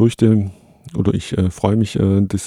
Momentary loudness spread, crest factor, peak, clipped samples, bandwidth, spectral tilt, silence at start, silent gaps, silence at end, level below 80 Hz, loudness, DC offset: 7 LU; 16 dB; 0 dBFS; under 0.1%; 12.5 kHz; -7.5 dB/octave; 0 s; none; 0 s; -42 dBFS; -17 LUFS; under 0.1%